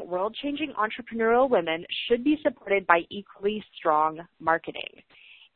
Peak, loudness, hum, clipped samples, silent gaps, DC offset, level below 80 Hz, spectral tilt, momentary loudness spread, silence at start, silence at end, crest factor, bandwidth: -2 dBFS; -26 LUFS; none; under 0.1%; none; under 0.1%; -62 dBFS; -9 dB/octave; 9 LU; 0 s; 0.7 s; 24 dB; 4.4 kHz